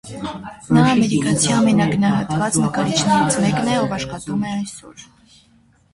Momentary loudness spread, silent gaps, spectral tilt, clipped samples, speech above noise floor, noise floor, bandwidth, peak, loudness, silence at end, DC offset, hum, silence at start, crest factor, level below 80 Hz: 14 LU; none; -5 dB/octave; under 0.1%; 37 dB; -55 dBFS; 11.5 kHz; -2 dBFS; -18 LUFS; 0.9 s; under 0.1%; none; 0.05 s; 16 dB; -48 dBFS